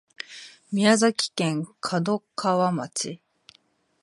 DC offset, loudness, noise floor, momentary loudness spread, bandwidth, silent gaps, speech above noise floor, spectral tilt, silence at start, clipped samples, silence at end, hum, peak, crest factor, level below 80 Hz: under 0.1%; -24 LUFS; -64 dBFS; 19 LU; 11.5 kHz; none; 40 dB; -4.5 dB/octave; 0.3 s; under 0.1%; 0.85 s; none; -4 dBFS; 22 dB; -74 dBFS